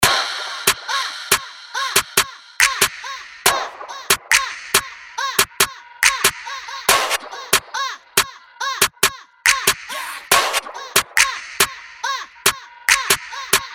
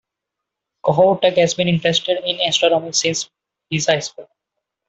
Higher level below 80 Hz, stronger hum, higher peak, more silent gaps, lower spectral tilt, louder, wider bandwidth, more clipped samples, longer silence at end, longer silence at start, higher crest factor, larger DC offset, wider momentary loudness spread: first, -50 dBFS vs -60 dBFS; neither; about the same, 0 dBFS vs 0 dBFS; neither; second, 0.5 dB/octave vs -3.5 dB/octave; about the same, -18 LUFS vs -17 LUFS; first, over 20 kHz vs 8.4 kHz; neither; second, 0 s vs 0.65 s; second, 0 s vs 0.85 s; about the same, 20 dB vs 18 dB; neither; about the same, 11 LU vs 10 LU